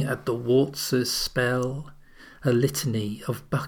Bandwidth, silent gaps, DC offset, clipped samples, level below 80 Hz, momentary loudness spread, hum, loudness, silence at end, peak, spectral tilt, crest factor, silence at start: over 20 kHz; none; under 0.1%; under 0.1%; -52 dBFS; 8 LU; none; -25 LUFS; 0 s; -10 dBFS; -5 dB/octave; 16 dB; 0 s